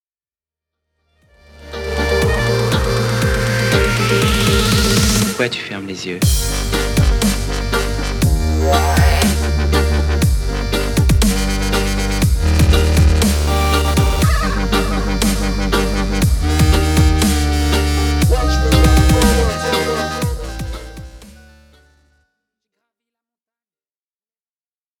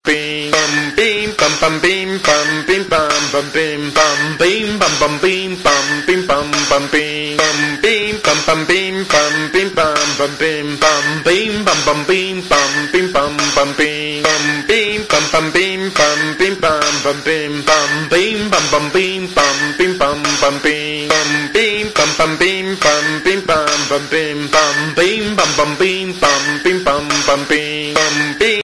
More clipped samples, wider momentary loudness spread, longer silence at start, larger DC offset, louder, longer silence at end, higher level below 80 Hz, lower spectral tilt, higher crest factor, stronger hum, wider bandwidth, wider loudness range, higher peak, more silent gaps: neither; first, 7 LU vs 3 LU; first, 1.6 s vs 0.05 s; second, under 0.1% vs 0.4%; second, -16 LUFS vs -13 LUFS; first, 3.7 s vs 0 s; first, -20 dBFS vs -44 dBFS; first, -5 dB/octave vs -2.5 dB/octave; about the same, 16 dB vs 14 dB; neither; first, 19 kHz vs 11 kHz; first, 4 LU vs 0 LU; about the same, 0 dBFS vs 0 dBFS; neither